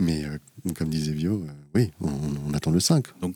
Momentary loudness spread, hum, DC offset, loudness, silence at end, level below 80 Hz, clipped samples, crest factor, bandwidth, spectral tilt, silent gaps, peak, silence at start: 9 LU; none; under 0.1%; -26 LUFS; 0 s; -46 dBFS; under 0.1%; 18 dB; 18.5 kHz; -5.5 dB/octave; none; -8 dBFS; 0 s